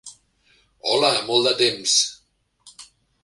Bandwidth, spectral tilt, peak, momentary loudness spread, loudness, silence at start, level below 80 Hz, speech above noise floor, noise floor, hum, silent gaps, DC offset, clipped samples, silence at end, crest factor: 11.5 kHz; -1.5 dB/octave; -4 dBFS; 7 LU; -19 LUFS; 0.05 s; -66 dBFS; 43 dB; -63 dBFS; none; none; under 0.1%; under 0.1%; 0.4 s; 20 dB